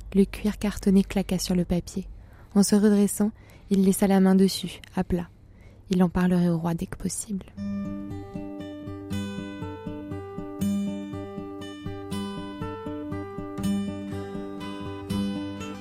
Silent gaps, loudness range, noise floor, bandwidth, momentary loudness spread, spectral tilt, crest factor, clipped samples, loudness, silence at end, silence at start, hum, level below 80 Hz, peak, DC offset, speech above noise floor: none; 10 LU; -49 dBFS; 16 kHz; 16 LU; -6 dB/octave; 18 dB; under 0.1%; -27 LUFS; 0 s; 0 s; none; -46 dBFS; -8 dBFS; under 0.1%; 26 dB